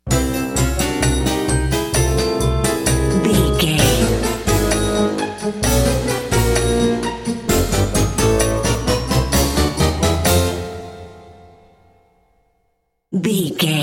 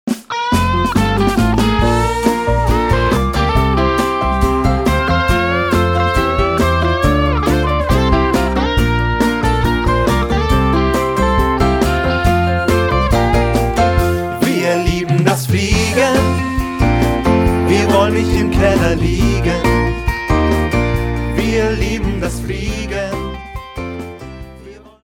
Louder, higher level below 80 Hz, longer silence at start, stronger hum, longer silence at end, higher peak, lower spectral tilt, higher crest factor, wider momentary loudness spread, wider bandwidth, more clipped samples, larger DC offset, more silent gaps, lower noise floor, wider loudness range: about the same, -17 LUFS vs -15 LUFS; about the same, -26 dBFS vs -22 dBFS; about the same, 0.05 s vs 0.05 s; neither; second, 0 s vs 0.3 s; about the same, -2 dBFS vs 0 dBFS; second, -4.5 dB/octave vs -6 dB/octave; about the same, 16 dB vs 14 dB; about the same, 6 LU vs 7 LU; about the same, 17 kHz vs 17.5 kHz; neither; neither; neither; first, -67 dBFS vs -37 dBFS; about the same, 5 LU vs 3 LU